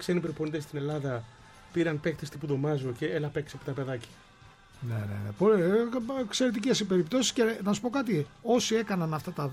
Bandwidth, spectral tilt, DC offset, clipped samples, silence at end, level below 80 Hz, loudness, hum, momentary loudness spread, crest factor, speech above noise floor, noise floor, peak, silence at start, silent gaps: 16 kHz; -5 dB/octave; under 0.1%; under 0.1%; 0 s; -62 dBFS; -30 LUFS; none; 11 LU; 18 dB; 26 dB; -55 dBFS; -12 dBFS; 0 s; none